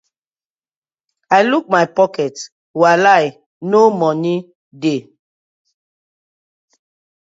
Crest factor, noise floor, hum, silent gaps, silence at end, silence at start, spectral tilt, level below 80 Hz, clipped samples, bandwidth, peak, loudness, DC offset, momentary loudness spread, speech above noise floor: 18 dB; under -90 dBFS; none; 2.52-2.74 s, 3.46-3.61 s, 4.55-4.71 s; 2.2 s; 1.3 s; -5.5 dB/octave; -68 dBFS; under 0.1%; 7.8 kHz; 0 dBFS; -15 LUFS; under 0.1%; 12 LU; over 76 dB